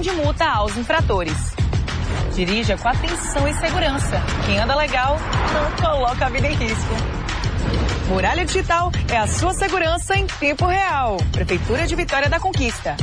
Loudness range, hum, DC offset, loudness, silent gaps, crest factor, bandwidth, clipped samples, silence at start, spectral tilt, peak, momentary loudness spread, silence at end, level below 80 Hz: 1 LU; none; 0.1%; -20 LUFS; none; 12 dB; 10.5 kHz; under 0.1%; 0 s; -4.5 dB/octave; -8 dBFS; 4 LU; 0 s; -26 dBFS